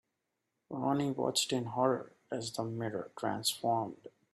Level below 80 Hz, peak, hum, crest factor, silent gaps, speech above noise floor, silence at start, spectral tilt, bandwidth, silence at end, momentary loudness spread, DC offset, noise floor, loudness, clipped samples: -76 dBFS; -16 dBFS; none; 20 dB; none; 50 dB; 0.7 s; -4 dB/octave; 14.5 kHz; 0.25 s; 10 LU; under 0.1%; -85 dBFS; -34 LUFS; under 0.1%